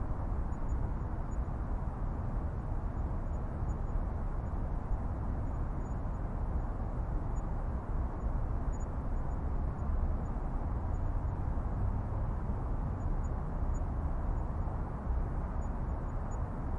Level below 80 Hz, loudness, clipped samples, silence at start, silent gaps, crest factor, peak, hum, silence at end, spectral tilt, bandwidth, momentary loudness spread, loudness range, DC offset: -36 dBFS; -38 LUFS; under 0.1%; 0 s; none; 12 dB; -22 dBFS; none; 0 s; -9.5 dB/octave; 7.4 kHz; 2 LU; 1 LU; under 0.1%